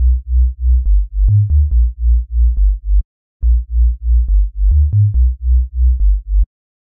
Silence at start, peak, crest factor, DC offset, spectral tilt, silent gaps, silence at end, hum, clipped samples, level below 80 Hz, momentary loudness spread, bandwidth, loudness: 0 s; -4 dBFS; 8 dB; under 0.1%; -15 dB/octave; 3.05-3.40 s; 0.4 s; none; under 0.1%; -12 dBFS; 6 LU; 0.3 kHz; -16 LUFS